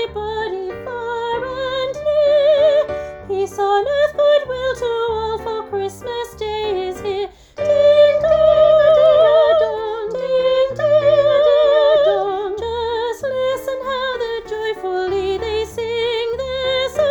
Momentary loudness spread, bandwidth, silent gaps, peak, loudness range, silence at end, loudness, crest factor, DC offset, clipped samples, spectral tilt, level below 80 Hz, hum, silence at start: 13 LU; 17.5 kHz; none; -2 dBFS; 8 LU; 0 s; -17 LUFS; 14 dB; under 0.1%; under 0.1%; -4.5 dB/octave; -44 dBFS; none; 0 s